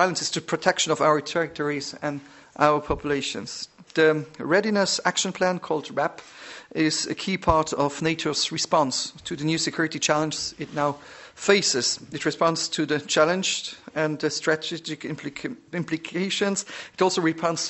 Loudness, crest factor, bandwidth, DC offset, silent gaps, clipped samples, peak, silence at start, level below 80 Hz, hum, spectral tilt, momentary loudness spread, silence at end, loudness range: -24 LUFS; 22 dB; 8.4 kHz; under 0.1%; none; under 0.1%; -2 dBFS; 0 s; -52 dBFS; none; -3.5 dB/octave; 11 LU; 0 s; 3 LU